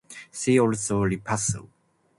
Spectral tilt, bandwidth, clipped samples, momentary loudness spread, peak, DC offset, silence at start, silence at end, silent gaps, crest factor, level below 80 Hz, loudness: -5 dB/octave; 11.5 kHz; under 0.1%; 11 LU; -8 dBFS; under 0.1%; 0.1 s; 0.5 s; none; 18 dB; -52 dBFS; -25 LUFS